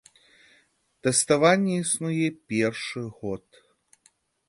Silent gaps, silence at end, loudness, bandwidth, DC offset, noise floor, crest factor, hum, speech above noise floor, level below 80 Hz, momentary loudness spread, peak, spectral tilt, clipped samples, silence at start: none; 1.1 s; -24 LUFS; 12 kHz; under 0.1%; -65 dBFS; 20 dB; none; 40 dB; -64 dBFS; 15 LU; -6 dBFS; -4 dB/octave; under 0.1%; 1.05 s